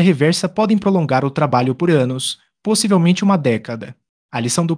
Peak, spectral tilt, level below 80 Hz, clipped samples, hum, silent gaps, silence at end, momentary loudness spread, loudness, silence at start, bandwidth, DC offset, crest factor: -2 dBFS; -5.5 dB/octave; -58 dBFS; under 0.1%; none; 4.09-4.29 s; 0 s; 12 LU; -16 LUFS; 0 s; 10.5 kHz; under 0.1%; 14 dB